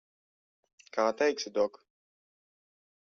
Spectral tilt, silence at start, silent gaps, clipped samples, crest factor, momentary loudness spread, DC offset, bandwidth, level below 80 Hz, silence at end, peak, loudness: -1.5 dB/octave; 0.95 s; none; under 0.1%; 20 dB; 6 LU; under 0.1%; 7.4 kHz; -80 dBFS; 1.45 s; -14 dBFS; -31 LUFS